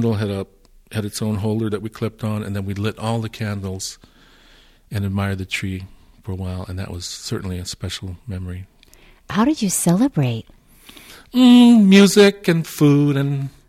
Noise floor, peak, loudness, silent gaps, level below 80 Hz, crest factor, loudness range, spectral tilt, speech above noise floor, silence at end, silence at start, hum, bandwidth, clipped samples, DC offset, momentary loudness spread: -50 dBFS; -2 dBFS; -18 LUFS; none; -50 dBFS; 16 dB; 14 LU; -5.5 dB/octave; 32 dB; 0.2 s; 0 s; none; 15.5 kHz; under 0.1%; under 0.1%; 20 LU